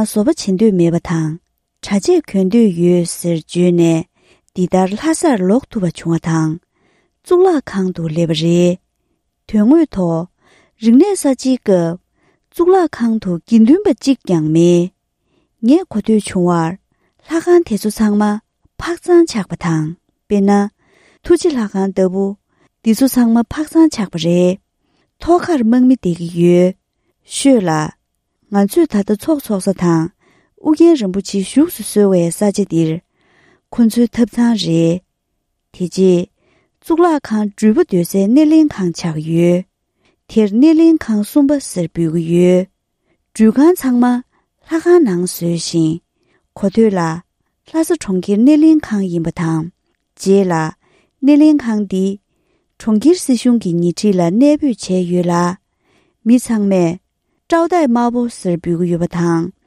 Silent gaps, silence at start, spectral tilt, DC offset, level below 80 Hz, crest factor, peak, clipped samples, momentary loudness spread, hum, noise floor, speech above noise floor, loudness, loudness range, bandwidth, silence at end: none; 0 s; -6.5 dB/octave; under 0.1%; -48 dBFS; 14 dB; 0 dBFS; under 0.1%; 10 LU; none; -70 dBFS; 57 dB; -14 LUFS; 3 LU; 15 kHz; 0.15 s